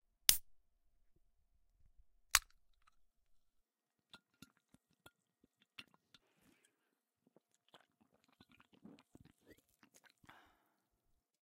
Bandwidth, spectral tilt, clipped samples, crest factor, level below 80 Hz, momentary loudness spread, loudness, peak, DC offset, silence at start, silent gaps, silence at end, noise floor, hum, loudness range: 15.5 kHz; 1.5 dB/octave; under 0.1%; 44 dB; -68 dBFS; 27 LU; -34 LUFS; -4 dBFS; under 0.1%; 0.3 s; none; 9.05 s; under -90 dBFS; none; 24 LU